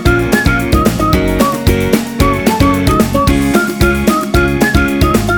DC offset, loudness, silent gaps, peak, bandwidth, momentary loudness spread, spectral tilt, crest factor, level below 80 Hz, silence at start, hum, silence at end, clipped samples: under 0.1%; -12 LUFS; none; 0 dBFS; over 20 kHz; 2 LU; -5.5 dB/octave; 10 dB; -20 dBFS; 0 s; none; 0 s; under 0.1%